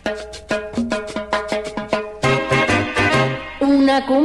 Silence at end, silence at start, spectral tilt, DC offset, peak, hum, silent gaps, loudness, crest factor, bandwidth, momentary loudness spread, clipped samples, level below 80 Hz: 0 s; 0.05 s; -5.5 dB/octave; under 0.1%; -2 dBFS; none; none; -19 LUFS; 16 dB; 12 kHz; 9 LU; under 0.1%; -42 dBFS